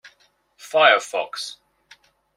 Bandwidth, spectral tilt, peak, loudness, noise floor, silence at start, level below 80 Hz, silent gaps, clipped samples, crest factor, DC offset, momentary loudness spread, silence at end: 15.5 kHz; -0.5 dB/octave; -2 dBFS; -19 LUFS; -61 dBFS; 0.65 s; -76 dBFS; none; under 0.1%; 22 dB; under 0.1%; 16 LU; 0.85 s